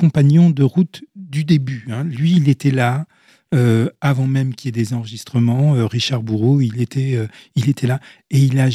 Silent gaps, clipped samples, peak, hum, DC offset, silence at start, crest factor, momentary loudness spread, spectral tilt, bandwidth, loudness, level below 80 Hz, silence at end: none; under 0.1%; -2 dBFS; none; under 0.1%; 0 s; 14 dB; 10 LU; -7.5 dB/octave; 12.5 kHz; -17 LUFS; -58 dBFS; 0 s